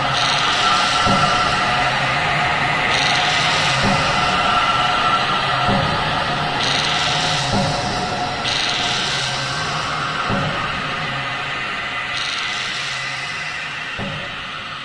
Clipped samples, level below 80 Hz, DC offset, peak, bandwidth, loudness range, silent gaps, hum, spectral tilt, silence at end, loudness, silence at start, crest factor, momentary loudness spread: under 0.1%; -40 dBFS; under 0.1%; -4 dBFS; 10.5 kHz; 6 LU; none; none; -3 dB/octave; 0 s; -18 LUFS; 0 s; 14 dB; 8 LU